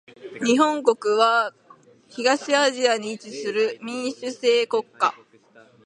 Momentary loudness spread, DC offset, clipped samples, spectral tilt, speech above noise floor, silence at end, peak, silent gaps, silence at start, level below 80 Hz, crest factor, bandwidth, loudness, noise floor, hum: 11 LU; under 0.1%; under 0.1%; -2.5 dB/octave; 32 dB; 0.7 s; -2 dBFS; none; 0.2 s; -76 dBFS; 20 dB; 11 kHz; -22 LUFS; -53 dBFS; none